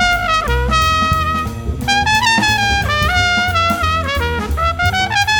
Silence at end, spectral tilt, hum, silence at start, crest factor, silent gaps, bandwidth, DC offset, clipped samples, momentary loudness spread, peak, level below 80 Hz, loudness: 0 s; -3.5 dB/octave; none; 0 s; 14 dB; none; 19 kHz; under 0.1%; under 0.1%; 6 LU; 0 dBFS; -24 dBFS; -14 LUFS